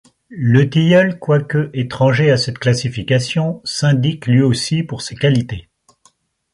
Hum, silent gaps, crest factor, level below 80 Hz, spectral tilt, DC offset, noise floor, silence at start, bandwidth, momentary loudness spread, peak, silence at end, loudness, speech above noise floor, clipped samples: none; none; 16 dB; -48 dBFS; -6 dB/octave; under 0.1%; -56 dBFS; 0.3 s; 11.5 kHz; 8 LU; 0 dBFS; 0.95 s; -16 LUFS; 41 dB; under 0.1%